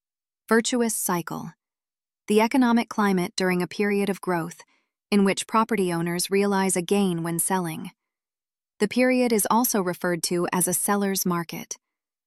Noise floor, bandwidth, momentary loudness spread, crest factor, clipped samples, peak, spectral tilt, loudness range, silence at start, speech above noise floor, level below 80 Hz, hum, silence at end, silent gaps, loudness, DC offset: under -90 dBFS; 15.5 kHz; 11 LU; 18 dB; under 0.1%; -8 dBFS; -4.5 dB/octave; 1 LU; 0.5 s; over 67 dB; -68 dBFS; none; 0.5 s; none; -23 LUFS; under 0.1%